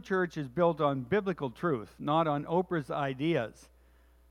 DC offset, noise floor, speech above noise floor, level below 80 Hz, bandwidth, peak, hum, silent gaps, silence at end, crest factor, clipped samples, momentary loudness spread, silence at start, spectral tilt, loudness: under 0.1%; -61 dBFS; 31 dB; -62 dBFS; 12.5 kHz; -14 dBFS; none; none; 0.65 s; 18 dB; under 0.1%; 6 LU; 0.05 s; -7.5 dB/octave; -31 LUFS